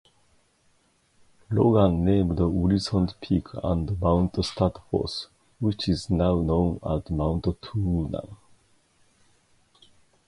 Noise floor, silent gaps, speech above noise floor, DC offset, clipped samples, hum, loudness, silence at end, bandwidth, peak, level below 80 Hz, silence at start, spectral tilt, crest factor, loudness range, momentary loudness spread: -65 dBFS; none; 41 dB; under 0.1%; under 0.1%; none; -25 LUFS; 1.95 s; 11.5 kHz; -6 dBFS; -38 dBFS; 1.5 s; -8 dB/octave; 20 dB; 5 LU; 8 LU